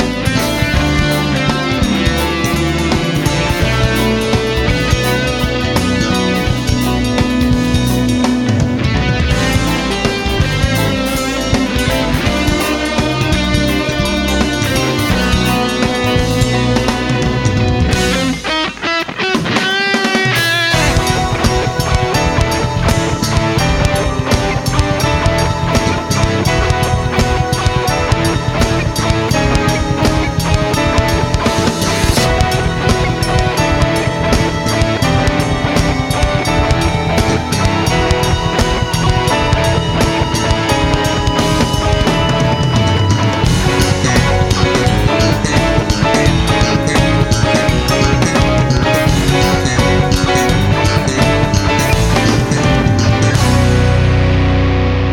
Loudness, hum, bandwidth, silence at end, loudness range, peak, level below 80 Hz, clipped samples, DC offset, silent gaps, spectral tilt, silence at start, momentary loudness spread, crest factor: -13 LUFS; none; 17.5 kHz; 0 s; 2 LU; 0 dBFS; -22 dBFS; under 0.1%; under 0.1%; none; -5 dB/octave; 0 s; 3 LU; 12 dB